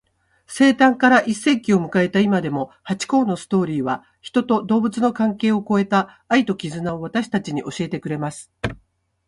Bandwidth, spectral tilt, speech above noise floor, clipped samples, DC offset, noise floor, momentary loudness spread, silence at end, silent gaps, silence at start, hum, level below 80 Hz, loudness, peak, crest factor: 11.5 kHz; -5.5 dB/octave; 41 dB; under 0.1%; under 0.1%; -60 dBFS; 12 LU; 0.5 s; none; 0.5 s; none; -54 dBFS; -20 LUFS; -4 dBFS; 16 dB